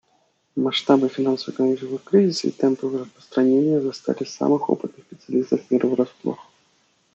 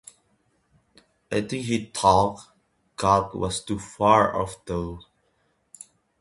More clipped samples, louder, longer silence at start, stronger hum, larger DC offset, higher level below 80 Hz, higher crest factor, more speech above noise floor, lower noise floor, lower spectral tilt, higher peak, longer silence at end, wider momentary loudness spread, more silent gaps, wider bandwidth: neither; about the same, -22 LUFS vs -24 LUFS; second, 0.55 s vs 1.3 s; neither; neither; second, -74 dBFS vs -48 dBFS; about the same, 20 dB vs 22 dB; about the same, 44 dB vs 46 dB; second, -65 dBFS vs -69 dBFS; about the same, -6 dB/octave vs -5 dB/octave; about the same, -2 dBFS vs -4 dBFS; second, 0.75 s vs 1.2 s; second, 10 LU vs 24 LU; neither; second, 8 kHz vs 11.5 kHz